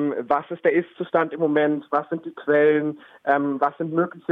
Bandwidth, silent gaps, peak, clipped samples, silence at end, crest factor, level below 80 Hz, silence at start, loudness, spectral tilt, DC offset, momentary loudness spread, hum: 4.1 kHz; none; -6 dBFS; under 0.1%; 0 s; 16 dB; -70 dBFS; 0 s; -23 LUFS; -9 dB/octave; under 0.1%; 7 LU; none